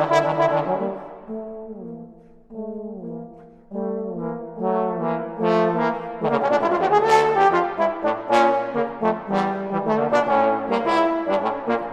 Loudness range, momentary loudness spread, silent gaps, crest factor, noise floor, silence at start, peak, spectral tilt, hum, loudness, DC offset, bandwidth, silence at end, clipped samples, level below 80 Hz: 13 LU; 17 LU; none; 18 dB; -45 dBFS; 0 s; -4 dBFS; -6 dB/octave; none; -21 LUFS; under 0.1%; 12 kHz; 0 s; under 0.1%; -58 dBFS